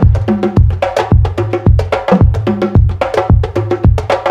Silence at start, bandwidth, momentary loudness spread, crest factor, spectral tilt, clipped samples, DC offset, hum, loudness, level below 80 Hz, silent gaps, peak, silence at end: 0 s; 8.4 kHz; 4 LU; 10 dB; -8.5 dB/octave; under 0.1%; 0.4%; none; -12 LUFS; -16 dBFS; none; 0 dBFS; 0 s